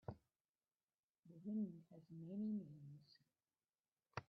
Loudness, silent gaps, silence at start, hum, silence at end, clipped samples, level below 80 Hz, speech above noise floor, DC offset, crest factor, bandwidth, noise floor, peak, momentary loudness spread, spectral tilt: -51 LUFS; 0.41-0.54 s, 0.83-0.87 s, 0.99-1.23 s, 3.80-3.84 s; 0.1 s; none; 0.05 s; under 0.1%; -82 dBFS; over 41 dB; under 0.1%; 22 dB; 6 kHz; under -90 dBFS; -32 dBFS; 18 LU; -7.5 dB/octave